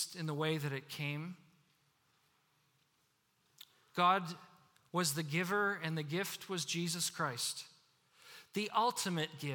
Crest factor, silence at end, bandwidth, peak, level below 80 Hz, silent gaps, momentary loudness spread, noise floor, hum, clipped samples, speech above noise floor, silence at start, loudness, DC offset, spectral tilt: 22 dB; 0 s; 18 kHz; -18 dBFS; -86 dBFS; none; 14 LU; -77 dBFS; none; under 0.1%; 40 dB; 0 s; -37 LUFS; under 0.1%; -3.5 dB/octave